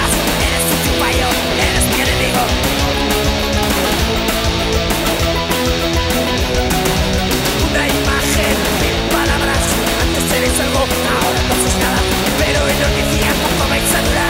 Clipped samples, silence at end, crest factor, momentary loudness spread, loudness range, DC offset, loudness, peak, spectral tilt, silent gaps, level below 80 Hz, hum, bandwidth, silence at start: under 0.1%; 0 s; 14 dB; 2 LU; 1 LU; under 0.1%; -14 LUFS; -2 dBFS; -3.5 dB/octave; none; -22 dBFS; none; 16.5 kHz; 0 s